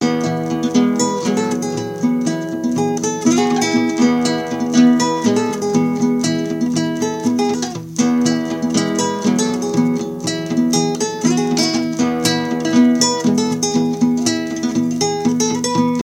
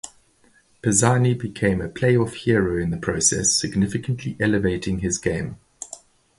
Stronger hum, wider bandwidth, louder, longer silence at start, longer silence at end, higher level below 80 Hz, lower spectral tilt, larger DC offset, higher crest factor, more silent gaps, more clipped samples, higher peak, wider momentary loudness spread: neither; first, 16 kHz vs 11.5 kHz; first, -17 LUFS vs -21 LUFS; about the same, 0 s vs 0.05 s; second, 0 s vs 0.4 s; second, -56 dBFS vs -44 dBFS; about the same, -4.5 dB/octave vs -4.5 dB/octave; neither; about the same, 16 dB vs 20 dB; neither; neither; about the same, 0 dBFS vs -2 dBFS; second, 5 LU vs 17 LU